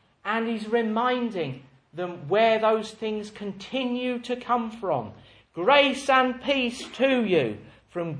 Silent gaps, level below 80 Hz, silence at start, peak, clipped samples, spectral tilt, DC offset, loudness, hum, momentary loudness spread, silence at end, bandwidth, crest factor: none; -64 dBFS; 0.25 s; -4 dBFS; under 0.1%; -5 dB/octave; under 0.1%; -25 LUFS; none; 15 LU; 0 s; 10.5 kHz; 22 dB